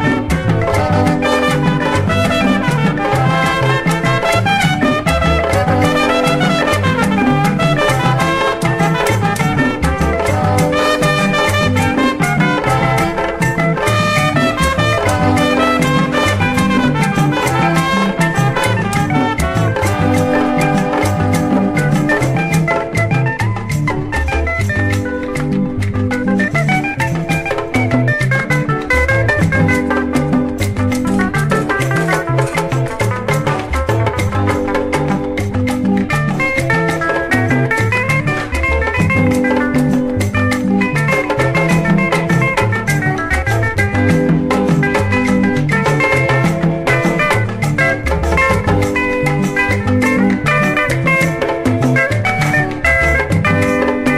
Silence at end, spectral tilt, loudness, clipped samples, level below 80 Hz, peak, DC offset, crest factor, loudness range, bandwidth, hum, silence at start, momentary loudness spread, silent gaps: 0 s; -6 dB/octave; -14 LUFS; under 0.1%; -30 dBFS; -2 dBFS; under 0.1%; 12 dB; 3 LU; 15 kHz; none; 0 s; 4 LU; none